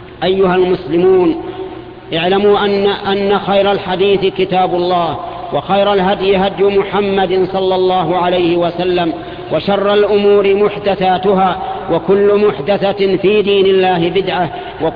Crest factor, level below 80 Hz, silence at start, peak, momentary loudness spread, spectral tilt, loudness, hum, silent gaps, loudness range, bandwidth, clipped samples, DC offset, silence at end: 10 dB; -42 dBFS; 0 s; -2 dBFS; 8 LU; -9 dB/octave; -13 LUFS; none; none; 1 LU; 5 kHz; under 0.1%; under 0.1%; 0 s